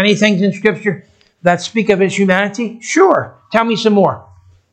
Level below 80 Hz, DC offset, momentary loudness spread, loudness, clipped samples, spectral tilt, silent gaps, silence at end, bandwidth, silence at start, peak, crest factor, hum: -56 dBFS; under 0.1%; 8 LU; -14 LUFS; under 0.1%; -5 dB/octave; none; 0.5 s; 9 kHz; 0 s; 0 dBFS; 14 dB; none